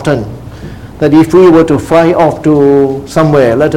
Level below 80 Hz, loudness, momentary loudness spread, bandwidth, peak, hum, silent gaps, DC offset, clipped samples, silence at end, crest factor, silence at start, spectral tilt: -34 dBFS; -8 LUFS; 21 LU; 14.5 kHz; 0 dBFS; none; none; 0.9%; 2%; 0 s; 8 dB; 0 s; -7.5 dB/octave